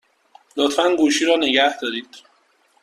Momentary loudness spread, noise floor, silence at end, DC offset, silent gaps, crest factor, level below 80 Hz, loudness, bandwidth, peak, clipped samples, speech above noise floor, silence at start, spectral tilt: 12 LU; -60 dBFS; 0.65 s; under 0.1%; none; 18 dB; -64 dBFS; -18 LUFS; 13.5 kHz; -2 dBFS; under 0.1%; 42 dB; 0.55 s; -1.5 dB/octave